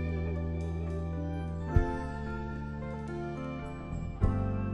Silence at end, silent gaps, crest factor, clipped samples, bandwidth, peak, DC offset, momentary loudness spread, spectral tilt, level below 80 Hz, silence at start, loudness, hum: 0 s; none; 22 dB; under 0.1%; 8.4 kHz; -12 dBFS; under 0.1%; 8 LU; -9 dB/octave; -40 dBFS; 0 s; -35 LUFS; none